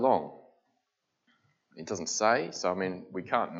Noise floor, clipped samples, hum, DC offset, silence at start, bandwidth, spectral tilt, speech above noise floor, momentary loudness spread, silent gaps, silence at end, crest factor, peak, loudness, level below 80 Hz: -81 dBFS; under 0.1%; none; under 0.1%; 0 s; 8 kHz; -3.5 dB/octave; 51 dB; 14 LU; none; 0 s; 22 dB; -10 dBFS; -30 LUFS; -78 dBFS